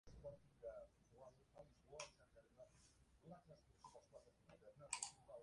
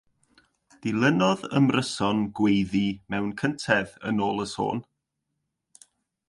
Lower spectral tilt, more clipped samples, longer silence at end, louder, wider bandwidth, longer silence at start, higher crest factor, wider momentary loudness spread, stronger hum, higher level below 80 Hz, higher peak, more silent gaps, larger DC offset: second, -2 dB/octave vs -5.5 dB/octave; neither; second, 0 s vs 1.45 s; second, -58 LUFS vs -25 LUFS; about the same, 11 kHz vs 11.5 kHz; second, 0.05 s vs 0.85 s; first, 32 dB vs 20 dB; first, 18 LU vs 8 LU; neither; second, -76 dBFS vs -58 dBFS; second, -30 dBFS vs -8 dBFS; neither; neither